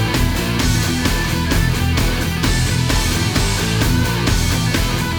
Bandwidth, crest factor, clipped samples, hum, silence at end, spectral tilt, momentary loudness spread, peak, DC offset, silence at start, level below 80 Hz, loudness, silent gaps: over 20 kHz; 12 dB; under 0.1%; none; 0 s; -4.5 dB/octave; 1 LU; -4 dBFS; under 0.1%; 0 s; -22 dBFS; -17 LUFS; none